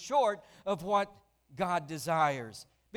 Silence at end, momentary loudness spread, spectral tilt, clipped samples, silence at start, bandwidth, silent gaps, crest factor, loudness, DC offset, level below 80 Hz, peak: 0 s; 11 LU; -4.5 dB/octave; under 0.1%; 0 s; 18 kHz; none; 16 dB; -32 LUFS; under 0.1%; -68 dBFS; -16 dBFS